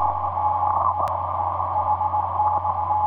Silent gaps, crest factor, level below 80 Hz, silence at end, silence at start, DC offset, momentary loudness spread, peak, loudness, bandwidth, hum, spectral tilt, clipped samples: none; 12 dB; -50 dBFS; 0 s; 0 s; under 0.1%; 3 LU; -10 dBFS; -23 LUFS; 4.9 kHz; none; -8 dB/octave; under 0.1%